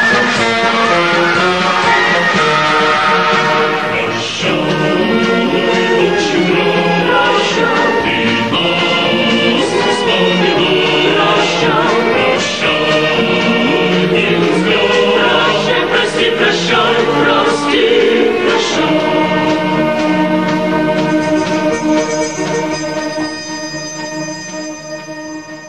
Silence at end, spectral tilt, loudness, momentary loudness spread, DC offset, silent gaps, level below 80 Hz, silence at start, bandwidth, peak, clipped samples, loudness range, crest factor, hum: 0 s; -4 dB/octave; -12 LUFS; 8 LU; 0.8%; none; -48 dBFS; 0 s; 13 kHz; 0 dBFS; under 0.1%; 4 LU; 12 dB; none